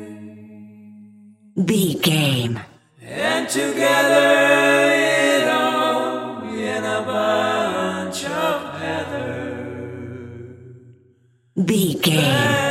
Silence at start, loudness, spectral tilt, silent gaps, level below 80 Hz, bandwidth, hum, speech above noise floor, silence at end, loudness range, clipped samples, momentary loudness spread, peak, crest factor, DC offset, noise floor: 0 s; -19 LUFS; -4.5 dB/octave; none; -62 dBFS; 16 kHz; none; 40 dB; 0 s; 10 LU; under 0.1%; 18 LU; -2 dBFS; 18 dB; under 0.1%; -57 dBFS